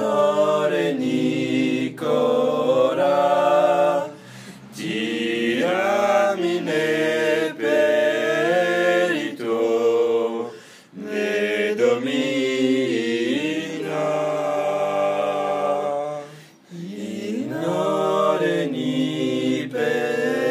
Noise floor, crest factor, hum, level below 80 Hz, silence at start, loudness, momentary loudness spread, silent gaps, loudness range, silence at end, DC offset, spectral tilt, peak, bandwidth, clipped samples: -43 dBFS; 16 dB; none; -76 dBFS; 0 s; -21 LUFS; 10 LU; none; 4 LU; 0 s; under 0.1%; -5 dB/octave; -6 dBFS; 15.5 kHz; under 0.1%